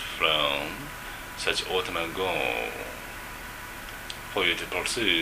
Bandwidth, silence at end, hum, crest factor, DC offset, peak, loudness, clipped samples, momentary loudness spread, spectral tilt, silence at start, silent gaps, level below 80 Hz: 15.5 kHz; 0 s; none; 22 dB; under 0.1%; -8 dBFS; -28 LUFS; under 0.1%; 14 LU; -2 dB/octave; 0 s; none; -48 dBFS